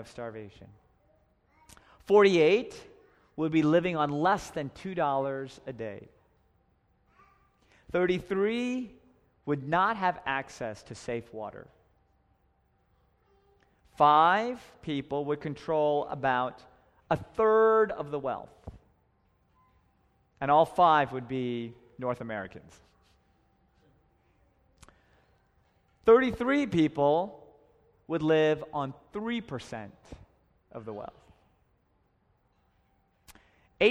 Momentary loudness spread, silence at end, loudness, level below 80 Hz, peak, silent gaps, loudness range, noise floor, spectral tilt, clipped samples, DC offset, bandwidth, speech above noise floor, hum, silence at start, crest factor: 20 LU; 0 s; -28 LUFS; -62 dBFS; -10 dBFS; none; 15 LU; -70 dBFS; -6.5 dB/octave; under 0.1%; under 0.1%; 11.5 kHz; 43 dB; none; 0 s; 22 dB